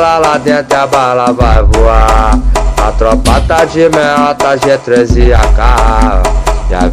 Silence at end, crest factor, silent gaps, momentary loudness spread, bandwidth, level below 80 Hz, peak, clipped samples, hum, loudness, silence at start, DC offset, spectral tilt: 0 s; 8 dB; none; 4 LU; 14 kHz; -10 dBFS; 0 dBFS; 4%; none; -9 LUFS; 0 s; under 0.1%; -5.5 dB/octave